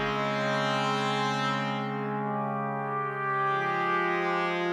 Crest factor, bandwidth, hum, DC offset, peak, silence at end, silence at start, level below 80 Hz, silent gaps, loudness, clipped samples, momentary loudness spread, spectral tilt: 14 dB; 12 kHz; none; under 0.1%; -14 dBFS; 0 s; 0 s; -66 dBFS; none; -28 LUFS; under 0.1%; 4 LU; -5.5 dB/octave